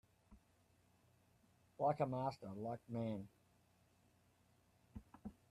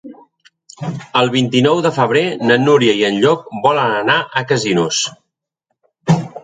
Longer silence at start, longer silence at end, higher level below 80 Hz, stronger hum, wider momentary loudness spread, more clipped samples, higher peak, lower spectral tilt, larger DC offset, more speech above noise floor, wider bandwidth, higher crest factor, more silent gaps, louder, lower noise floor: first, 0.3 s vs 0.05 s; first, 0.2 s vs 0.05 s; second, -74 dBFS vs -58 dBFS; neither; first, 21 LU vs 7 LU; neither; second, -26 dBFS vs 0 dBFS; first, -8.5 dB/octave vs -4.5 dB/octave; neither; second, 32 dB vs 59 dB; first, 14 kHz vs 9.4 kHz; first, 22 dB vs 16 dB; neither; second, -44 LUFS vs -14 LUFS; about the same, -75 dBFS vs -73 dBFS